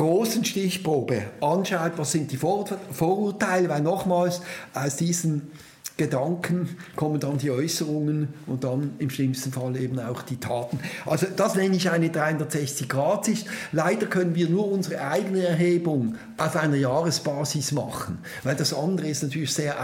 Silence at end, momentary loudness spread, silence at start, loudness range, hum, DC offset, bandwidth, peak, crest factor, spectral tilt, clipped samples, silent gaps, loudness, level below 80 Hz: 0 s; 7 LU; 0 s; 3 LU; none; under 0.1%; 17 kHz; -8 dBFS; 18 dB; -5 dB/octave; under 0.1%; none; -25 LUFS; -64 dBFS